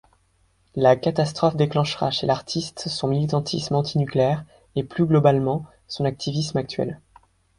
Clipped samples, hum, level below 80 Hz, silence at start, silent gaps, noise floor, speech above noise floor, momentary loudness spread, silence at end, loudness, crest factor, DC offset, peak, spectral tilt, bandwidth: under 0.1%; none; -54 dBFS; 0.75 s; none; -63 dBFS; 42 dB; 11 LU; 0.65 s; -23 LUFS; 20 dB; under 0.1%; -4 dBFS; -6.5 dB/octave; 11 kHz